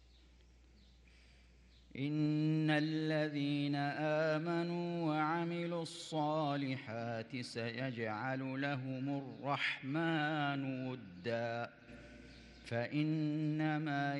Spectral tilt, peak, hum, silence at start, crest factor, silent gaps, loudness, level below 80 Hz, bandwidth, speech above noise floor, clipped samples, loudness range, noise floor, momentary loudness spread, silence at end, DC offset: -7 dB/octave; -22 dBFS; none; 1.9 s; 16 dB; none; -38 LUFS; -70 dBFS; 10 kHz; 26 dB; under 0.1%; 4 LU; -63 dBFS; 9 LU; 0 s; under 0.1%